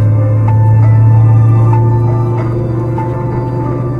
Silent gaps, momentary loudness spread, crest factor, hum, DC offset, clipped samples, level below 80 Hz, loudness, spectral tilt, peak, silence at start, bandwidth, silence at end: none; 8 LU; 8 dB; none; under 0.1%; under 0.1%; -30 dBFS; -10 LUFS; -11 dB/octave; 0 dBFS; 0 s; 2.8 kHz; 0 s